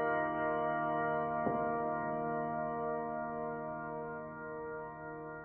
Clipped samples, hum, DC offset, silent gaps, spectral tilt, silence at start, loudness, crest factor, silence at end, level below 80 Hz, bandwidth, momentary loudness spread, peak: under 0.1%; none; under 0.1%; none; -6 dB/octave; 0 s; -37 LUFS; 16 dB; 0 s; -66 dBFS; 3.2 kHz; 10 LU; -22 dBFS